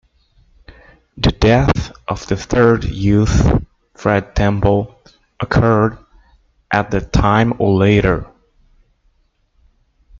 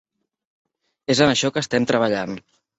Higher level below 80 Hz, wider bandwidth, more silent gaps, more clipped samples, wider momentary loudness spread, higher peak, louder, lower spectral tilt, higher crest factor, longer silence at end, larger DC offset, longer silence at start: first, -28 dBFS vs -56 dBFS; second, 7.6 kHz vs 8.4 kHz; neither; neither; second, 9 LU vs 15 LU; first, 0 dBFS vs -4 dBFS; first, -15 LUFS vs -20 LUFS; first, -7 dB/octave vs -4 dB/octave; about the same, 16 dB vs 20 dB; first, 1.95 s vs 0.4 s; neither; second, 0.7 s vs 1.1 s